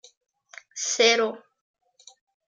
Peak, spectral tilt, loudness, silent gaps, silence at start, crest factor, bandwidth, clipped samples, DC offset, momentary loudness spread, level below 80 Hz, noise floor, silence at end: -8 dBFS; 0 dB/octave; -22 LUFS; none; 0.75 s; 22 dB; 9.6 kHz; under 0.1%; under 0.1%; 21 LU; -88 dBFS; -46 dBFS; 1.15 s